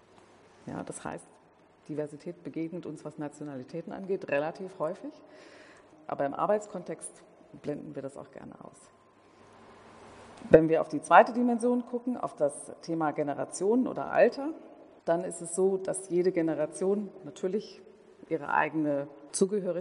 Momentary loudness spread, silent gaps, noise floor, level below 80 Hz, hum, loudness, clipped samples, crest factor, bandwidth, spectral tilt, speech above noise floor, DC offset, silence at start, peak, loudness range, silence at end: 17 LU; none; -59 dBFS; -64 dBFS; none; -30 LUFS; under 0.1%; 26 dB; 10.5 kHz; -5.5 dB/octave; 29 dB; under 0.1%; 0.65 s; -4 dBFS; 14 LU; 0 s